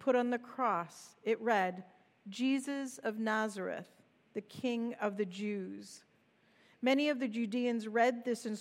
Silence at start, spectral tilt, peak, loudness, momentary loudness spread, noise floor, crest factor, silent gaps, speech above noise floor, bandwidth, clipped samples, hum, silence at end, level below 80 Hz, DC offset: 0 s; -5 dB/octave; -16 dBFS; -35 LUFS; 15 LU; -70 dBFS; 20 dB; none; 35 dB; 15 kHz; under 0.1%; none; 0 s; under -90 dBFS; under 0.1%